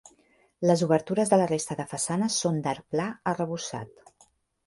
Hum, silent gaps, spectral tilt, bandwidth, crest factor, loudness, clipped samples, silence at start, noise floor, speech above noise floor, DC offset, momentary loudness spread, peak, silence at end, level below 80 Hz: none; none; -5 dB/octave; 11.5 kHz; 20 dB; -27 LUFS; under 0.1%; 0.6 s; -64 dBFS; 37 dB; under 0.1%; 10 LU; -8 dBFS; 0.8 s; -66 dBFS